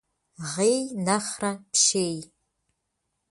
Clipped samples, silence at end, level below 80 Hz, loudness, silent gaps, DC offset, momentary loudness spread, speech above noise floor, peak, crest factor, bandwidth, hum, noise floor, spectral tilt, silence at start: under 0.1%; 1.05 s; -68 dBFS; -24 LUFS; none; under 0.1%; 13 LU; 53 dB; -8 dBFS; 18 dB; 11.5 kHz; none; -79 dBFS; -3 dB/octave; 0.4 s